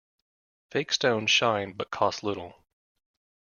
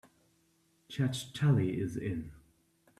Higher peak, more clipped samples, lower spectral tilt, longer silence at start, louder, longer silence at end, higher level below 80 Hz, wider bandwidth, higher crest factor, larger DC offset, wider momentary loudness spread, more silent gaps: first, -10 dBFS vs -18 dBFS; neither; second, -3 dB/octave vs -6.5 dB/octave; second, 0.75 s vs 0.9 s; first, -26 LUFS vs -33 LUFS; first, 0.95 s vs 0.6 s; second, -68 dBFS vs -62 dBFS; second, 7.4 kHz vs 13.5 kHz; about the same, 20 dB vs 18 dB; neither; about the same, 12 LU vs 14 LU; neither